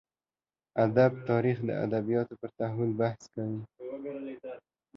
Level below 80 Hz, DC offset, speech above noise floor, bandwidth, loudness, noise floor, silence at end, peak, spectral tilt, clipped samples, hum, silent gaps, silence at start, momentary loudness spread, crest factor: -68 dBFS; under 0.1%; over 60 dB; 7.4 kHz; -31 LUFS; under -90 dBFS; 0.35 s; -10 dBFS; -9 dB/octave; under 0.1%; none; none; 0.75 s; 16 LU; 20 dB